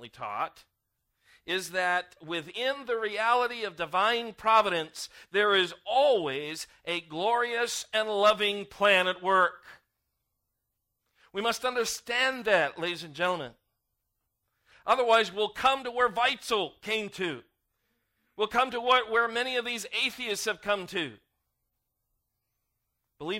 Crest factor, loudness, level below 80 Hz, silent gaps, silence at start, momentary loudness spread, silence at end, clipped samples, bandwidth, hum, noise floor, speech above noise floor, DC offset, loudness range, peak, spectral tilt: 20 dB; -28 LUFS; -68 dBFS; none; 0 s; 11 LU; 0 s; under 0.1%; 16 kHz; none; -82 dBFS; 54 dB; under 0.1%; 4 LU; -10 dBFS; -2.5 dB/octave